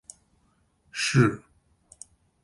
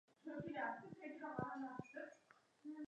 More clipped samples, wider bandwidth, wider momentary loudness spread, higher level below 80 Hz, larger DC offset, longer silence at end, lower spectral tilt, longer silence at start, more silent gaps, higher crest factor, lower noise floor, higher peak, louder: neither; first, 11.5 kHz vs 9.6 kHz; first, 26 LU vs 11 LU; first, -60 dBFS vs -82 dBFS; neither; first, 1.05 s vs 0 s; second, -5 dB/octave vs -7.5 dB/octave; first, 0.95 s vs 0.25 s; neither; about the same, 22 dB vs 20 dB; second, -67 dBFS vs -73 dBFS; first, -8 dBFS vs -30 dBFS; first, -24 LUFS vs -50 LUFS